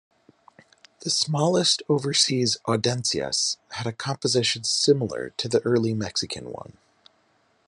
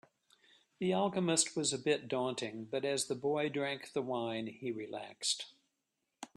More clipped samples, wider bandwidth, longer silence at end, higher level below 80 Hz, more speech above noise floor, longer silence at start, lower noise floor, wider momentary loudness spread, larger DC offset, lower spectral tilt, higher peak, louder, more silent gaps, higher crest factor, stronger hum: neither; second, 11.5 kHz vs 13 kHz; first, 1.05 s vs 0.1 s; first, -66 dBFS vs -80 dBFS; second, 41 dB vs 50 dB; first, 1 s vs 0.8 s; second, -65 dBFS vs -86 dBFS; about the same, 10 LU vs 10 LU; neither; about the same, -3.5 dB/octave vs -3.5 dB/octave; first, -6 dBFS vs -14 dBFS; first, -23 LUFS vs -36 LUFS; neither; about the same, 20 dB vs 24 dB; neither